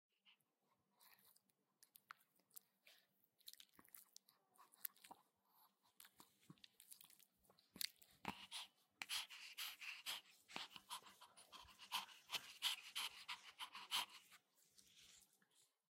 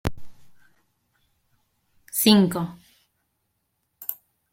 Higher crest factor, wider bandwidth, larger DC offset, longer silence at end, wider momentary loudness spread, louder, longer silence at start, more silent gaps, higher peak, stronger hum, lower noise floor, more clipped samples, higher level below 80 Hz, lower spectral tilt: first, 32 dB vs 24 dB; about the same, 16 kHz vs 16.5 kHz; neither; about the same, 0.35 s vs 0.4 s; first, 21 LU vs 17 LU; second, -50 LUFS vs -22 LUFS; first, 0.25 s vs 0.05 s; neither; second, -24 dBFS vs -4 dBFS; neither; first, -87 dBFS vs -75 dBFS; neither; second, under -90 dBFS vs -50 dBFS; second, 0.5 dB/octave vs -4.5 dB/octave